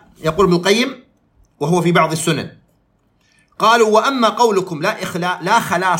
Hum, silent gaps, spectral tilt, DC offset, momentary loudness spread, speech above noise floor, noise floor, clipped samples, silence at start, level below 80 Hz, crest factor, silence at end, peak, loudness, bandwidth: none; none; -4.5 dB/octave; under 0.1%; 9 LU; 45 dB; -60 dBFS; under 0.1%; 0.2 s; -50 dBFS; 16 dB; 0 s; 0 dBFS; -16 LUFS; 16.5 kHz